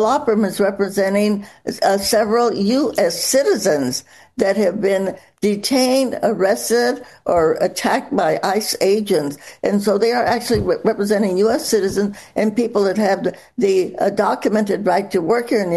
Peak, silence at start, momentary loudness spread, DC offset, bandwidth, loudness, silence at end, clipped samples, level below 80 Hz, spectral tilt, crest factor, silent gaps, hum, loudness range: -2 dBFS; 0 s; 5 LU; 0.1%; 12.5 kHz; -18 LUFS; 0 s; under 0.1%; -50 dBFS; -4.5 dB/octave; 16 dB; none; none; 1 LU